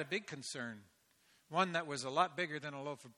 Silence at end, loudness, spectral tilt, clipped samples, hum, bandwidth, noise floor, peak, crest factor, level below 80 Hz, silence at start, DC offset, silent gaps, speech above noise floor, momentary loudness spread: 0.05 s; -39 LUFS; -4 dB/octave; under 0.1%; none; 14.5 kHz; -72 dBFS; -16 dBFS; 24 dB; -84 dBFS; 0 s; under 0.1%; none; 33 dB; 10 LU